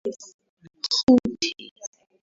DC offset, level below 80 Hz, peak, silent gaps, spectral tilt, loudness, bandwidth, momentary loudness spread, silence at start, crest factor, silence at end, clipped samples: under 0.1%; -56 dBFS; -6 dBFS; 0.34-0.39 s, 0.49-0.57 s, 1.03-1.07 s, 1.71-1.76 s; -3.5 dB/octave; -22 LUFS; 7.8 kHz; 22 LU; 0.05 s; 20 dB; 0.4 s; under 0.1%